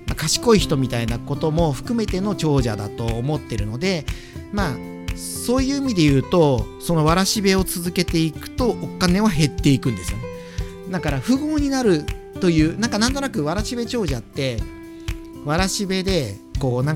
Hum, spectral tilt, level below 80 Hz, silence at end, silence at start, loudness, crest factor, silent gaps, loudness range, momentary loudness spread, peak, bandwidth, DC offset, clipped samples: none; -5 dB/octave; -34 dBFS; 0 s; 0 s; -21 LUFS; 20 dB; none; 5 LU; 13 LU; 0 dBFS; 17 kHz; under 0.1%; under 0.1%